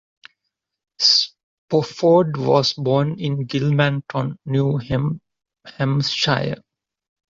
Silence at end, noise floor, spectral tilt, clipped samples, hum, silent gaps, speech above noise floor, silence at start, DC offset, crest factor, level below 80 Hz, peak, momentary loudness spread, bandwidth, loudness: 0.75 s; -79 dBFS; -5.5 dB/octave; under 0.1%; none; 1.43-1.68 s; 60 dB; 1 s; under 0.1%; 18 dB; -52 dBFS; -2 dBFS; 10 LU; 7.6 kHz; -19 LUFS